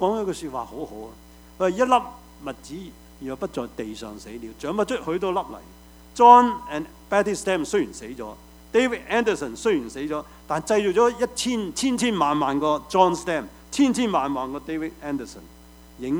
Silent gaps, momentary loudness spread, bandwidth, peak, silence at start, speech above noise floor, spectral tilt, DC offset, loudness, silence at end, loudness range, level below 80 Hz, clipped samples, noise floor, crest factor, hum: none; 17 LU; over 20 kHz; 0 dBFS; 0 s; 23 dB; -4.5 dB/octave; under 0.1%; -23 LUFS; 0 s; 8 LU; -50 dBFS; under 0.1%; -46 dBFS; 24 dB; none